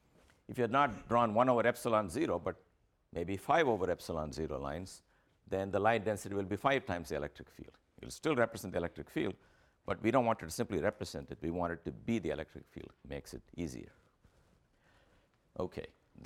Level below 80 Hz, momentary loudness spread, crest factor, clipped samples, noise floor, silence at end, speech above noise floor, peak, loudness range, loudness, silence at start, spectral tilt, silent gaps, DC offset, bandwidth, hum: -60 dBFS; 19 LU; 22 dB; under 0.1%; -70 dBFS; 0 s; 35 dB; -14 dBFS; 10 LU; -35 LUFS; 0.5 s; -5.5 dB/octave; none; under 0.1%; 17 kHz; none